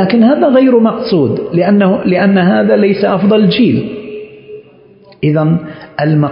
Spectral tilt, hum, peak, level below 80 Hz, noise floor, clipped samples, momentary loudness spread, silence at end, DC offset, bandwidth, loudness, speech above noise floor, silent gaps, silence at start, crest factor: -12.5 dB/octave; none; 0 dBFS; -50 dBFS; -41 dBFS; under 0.1%; 13 LU; 0 s; under 0.1%; 5.4 kHz; -10 LUFS; 31 dB; none; 0 s; 10 dB